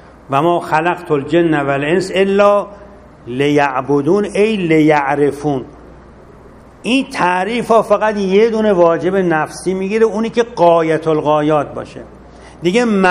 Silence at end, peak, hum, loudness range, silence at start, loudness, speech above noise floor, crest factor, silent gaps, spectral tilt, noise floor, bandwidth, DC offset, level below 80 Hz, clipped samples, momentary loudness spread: 0 s; 0 dBFS; none; 2 LU; 0.3 s; -14 LUFS; 26 dB; 14 dB; none; -6 dB/octave; -39 dBFS; 12.5 kHz; under 0.1%; -46 dBFS; under 0.1%; 8 LU